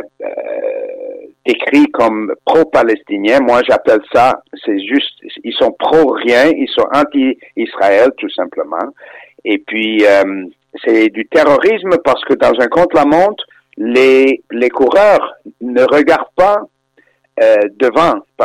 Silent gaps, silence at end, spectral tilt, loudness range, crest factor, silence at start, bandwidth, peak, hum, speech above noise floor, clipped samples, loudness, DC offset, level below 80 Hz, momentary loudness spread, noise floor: none; 0 s; -5 dB/octave; 3 LU; 10 dB; 0 s; 12.5 kHz; -2 dBFS; none; 43 dB; under 0.1%; -12 LUFS; under 0.1%; -50 dBFS; 12 LU; -54 dBFS